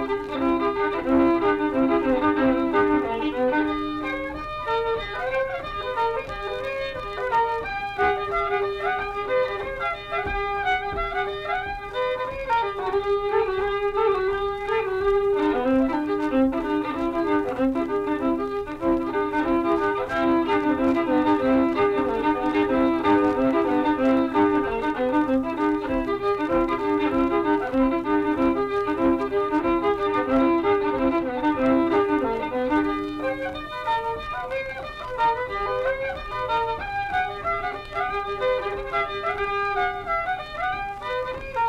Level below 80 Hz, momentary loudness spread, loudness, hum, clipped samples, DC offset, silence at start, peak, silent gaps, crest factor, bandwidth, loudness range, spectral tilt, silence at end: -44 dBFS; 8 LU; -24 LUFS; none; under 0.1%; under 0.1%; 0 s; -8 dBFS; none; 14 dB; 11 kHz; 5 LU; -6.5 dB/octave; 0 s